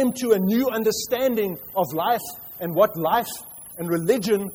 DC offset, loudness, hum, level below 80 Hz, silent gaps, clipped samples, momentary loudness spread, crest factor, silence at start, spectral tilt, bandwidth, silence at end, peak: under 0.1%; -23 LUFS; none; -60 dBFS; none; under 0.1%; 12 LU; 18 dB; 0 s; -5 dB/octave; over 20 kHz; 0 s; -6 dBFS